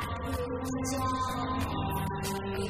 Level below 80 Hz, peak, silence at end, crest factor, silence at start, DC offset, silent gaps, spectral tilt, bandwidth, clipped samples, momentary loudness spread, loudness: -44 dBFS; -18 dBFS; 0 s; 14 dB; 0 s; under 0.1%; none; -5 dB/octave; 16 kHz; under 0.1%; 3 LU; -33 LUFS